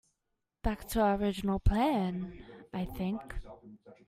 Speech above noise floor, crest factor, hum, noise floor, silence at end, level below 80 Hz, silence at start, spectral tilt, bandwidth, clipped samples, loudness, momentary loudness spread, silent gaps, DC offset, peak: 53 dB; 18 dB; none; -84 dBFS; 0.15 s; -42 dBFS; 0.65 s; -6.5 dB/octave; 16 kHz; under 0.1%; -33 LUFS; 18 LU; none; under 0.1%; -16 dBFS